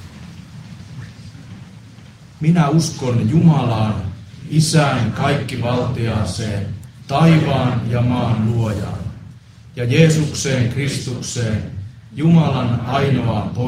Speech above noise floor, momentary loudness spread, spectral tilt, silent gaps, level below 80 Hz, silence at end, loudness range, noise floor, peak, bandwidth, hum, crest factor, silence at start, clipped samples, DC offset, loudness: 24 dB; 22 LU; -6 dB/octave; none; -44 dBFS; 0 s; 3 LU; -40 dBFS; 0 dBFS; 12.5 kHz; none; 18 dB; 0 s; under 0.1%; under 0.1%; -17 LUFS